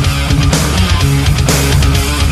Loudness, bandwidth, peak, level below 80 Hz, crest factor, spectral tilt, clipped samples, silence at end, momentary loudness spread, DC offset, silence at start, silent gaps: -11 LUFS; 15 kHz; 0 dBFS; -16 dBFS; 10 dB; -4.5 dB/octave; under 0.1%; 0 s; 2 LU; under 0.1%; 0 s; none